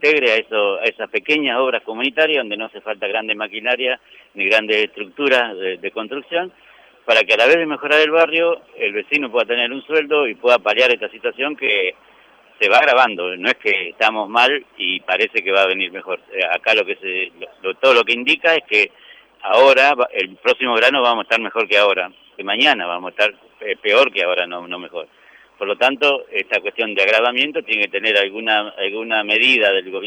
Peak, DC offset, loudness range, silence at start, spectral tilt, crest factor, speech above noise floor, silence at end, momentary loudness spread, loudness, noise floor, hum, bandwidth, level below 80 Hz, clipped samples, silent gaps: 0 dBFS; under 0.1%; 4 LU; 0 s; -2.5 dB/octave; 16 dB; 32 dB; 0 s; 12 LU; -16 LUFS; -50 dBFS; none; 11 kHz; -72 dBFS; under 0.1%; none